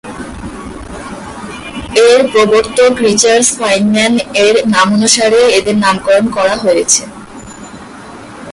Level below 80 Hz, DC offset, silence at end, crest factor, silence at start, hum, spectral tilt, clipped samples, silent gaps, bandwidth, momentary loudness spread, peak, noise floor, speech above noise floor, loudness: -40 dBFS; under 0.1%; 0 s; 12 dB; 0.05 s; none; -3 dB/octave; under 0.1%; none; 11.5 kHz; 22 LU; 0 dBFS; -30 dBFS; 21 dB; -9 LUFS